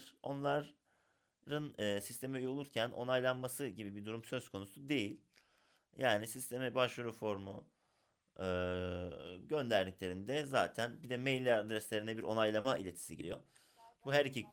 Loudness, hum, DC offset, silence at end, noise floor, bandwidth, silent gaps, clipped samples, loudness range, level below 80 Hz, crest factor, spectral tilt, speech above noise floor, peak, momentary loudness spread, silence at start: -39 LUFS; none; under 0.1%; 0 s; -80 dBFS; over 20 kHz; none; under 0.1%; 4 LU; -76 dBFS; 20 dB; -4.5 dB/octave; 41 dB; -20 dBFS; 12 LU; 0 s